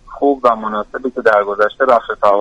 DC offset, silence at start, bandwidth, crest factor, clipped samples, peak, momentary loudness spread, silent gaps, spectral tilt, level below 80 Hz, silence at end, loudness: under 0.1%; 0.05 s; 9.2 kHz; 14 dB; under 0.1%; 0 dBFS; 8 LU; none; -5.5 dB/octave; -48 dBFS; 0 s; -15 LUFS